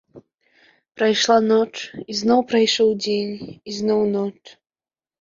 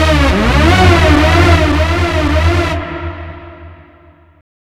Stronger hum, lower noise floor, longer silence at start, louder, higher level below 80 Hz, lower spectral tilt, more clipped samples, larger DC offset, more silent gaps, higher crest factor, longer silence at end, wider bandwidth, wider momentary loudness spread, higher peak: neither; first, -58 dBFS vs -43 dBFS; first, 0.15 s vs 0 s; second, -19 LUFS vs -10 LUFS; second, -62 dBFS vs -18 dBFS; second, -4 dB/octave vs -6 dB/octave; second, under 0.1% vs 0.2%; neither; neither; first, 18 dB vs 12 dB; about the same, 0.9 s vs 0.95 s; second, 7.6 kHz vs 13.5 kHz; second, 13 LU vs 17 LU; about the same, -2 dBFS vs 0 dBFS